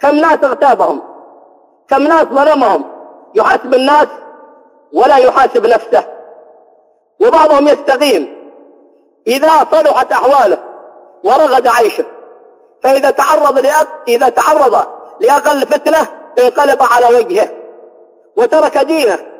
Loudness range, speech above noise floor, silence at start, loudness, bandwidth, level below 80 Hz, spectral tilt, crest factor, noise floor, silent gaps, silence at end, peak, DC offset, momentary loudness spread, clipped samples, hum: 2 LU; 41 dB; 0 s; -10 LUFS; 16 kHz; -54 dBFS; -3 dB/octave; 10 dB; -50 dBFS; none; 0.1 s; 0 dBFS; under 0.1%; 9 LU; under 0.1%; none